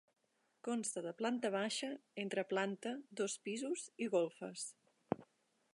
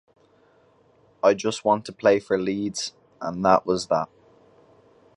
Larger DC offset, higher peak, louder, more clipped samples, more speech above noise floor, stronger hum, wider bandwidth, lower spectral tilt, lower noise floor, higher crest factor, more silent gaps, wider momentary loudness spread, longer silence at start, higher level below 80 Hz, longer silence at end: neither; second, -18 dBFS vs -2 dBFS; second, -41 LUFS vs -23 LUFS; neither; second, 32 dB vs 37 dB; neither; about the same, 11.5 kHz vs 11 kHz; about the same, -3.5 dB/octave vs -4.5 dB/octave; first, -73 dBFS vs -59 dBFS; about the same, 24 dB vs 22 dB; neither; second, 8 LU vs 12 LU; second, 0.65 s vs 1.25 s; second, -86 dBFS vs -60 dBFS; second, 0.5 s vs 1.1 s